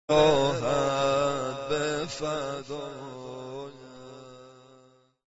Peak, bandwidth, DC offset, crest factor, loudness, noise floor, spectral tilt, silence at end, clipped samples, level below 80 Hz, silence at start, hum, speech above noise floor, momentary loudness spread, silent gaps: -8 dBFS; 8 kHz; under 0.1%; 20 dB; -27 LUFS; -59 dBFS; -4.5 dB/octave; 0.75 s; under 0.1%; -54 dBFS; 0.1 s; none; 34 dB; 24 LU; none